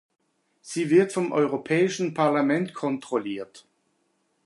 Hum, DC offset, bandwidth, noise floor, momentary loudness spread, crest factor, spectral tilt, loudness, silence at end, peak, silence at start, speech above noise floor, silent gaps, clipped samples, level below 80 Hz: none; under 0.1%; 11.5 kHz; -71 dBFS; 13 LU; 18 dB; -6 dB/octave; -24 LUFS; 0.85 s; -8 dBFS; 0.65 s; 47 dB; none; under 0.1%; -76 dBFS